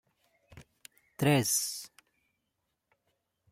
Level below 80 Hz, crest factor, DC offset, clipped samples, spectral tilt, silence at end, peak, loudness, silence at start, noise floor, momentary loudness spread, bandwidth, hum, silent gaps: -70 dBFS; 22 dB; under 0.1%; under 0.1%; -4 dB/octave; 1.65 s; -12 dBFS; -29 LUFS; 0.55 s; -83 dBFS; 24 LU; 16 kHz; none; none